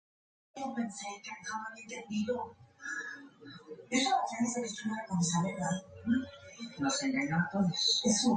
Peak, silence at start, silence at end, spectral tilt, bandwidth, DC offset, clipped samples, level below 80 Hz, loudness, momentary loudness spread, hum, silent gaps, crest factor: -16 dBFS; 0.55 s; 0 s; -3.5 dB/octave; 9.4 kHz; under 0.1%; under 0.1%; -68 dBFS; -33 LUFS; 17 LU; none; none; 18 dB